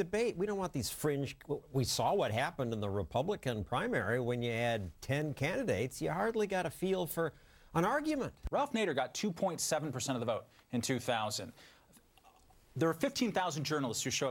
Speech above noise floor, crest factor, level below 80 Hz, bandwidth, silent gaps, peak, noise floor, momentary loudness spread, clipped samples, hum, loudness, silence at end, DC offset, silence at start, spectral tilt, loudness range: 29 dB; 18 dB; -58 dBFS; 17 kHz; none; -18 dBFS; -64 dBFS; 6 LU; under 0.1%; none; -35 LUFS; 0 s; under 0.1%; 0 s; -4.5 dB/octave; 2 LU